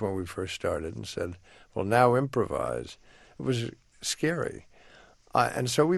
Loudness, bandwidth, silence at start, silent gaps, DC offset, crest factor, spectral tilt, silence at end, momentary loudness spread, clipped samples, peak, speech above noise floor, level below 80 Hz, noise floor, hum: -29 LUFS; 12.5 kHz; 0 s; none; under 0.1%; 24 dB; -5 dB/octave; 0 s; 14 LU; under 0.1%; -6 dBFS; 27 dB; -56 dBFS; -56 dBFS; none